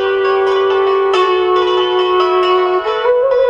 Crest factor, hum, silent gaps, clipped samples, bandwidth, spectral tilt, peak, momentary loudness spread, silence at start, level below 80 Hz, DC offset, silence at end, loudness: 10 dB; none; none; under 0.1%; 7.4 kHz; -4 dB/octave; -2 dBFS; 1 LU; 0 s; -52 dBFS; under 0.1%; 0 s; -13 LUFS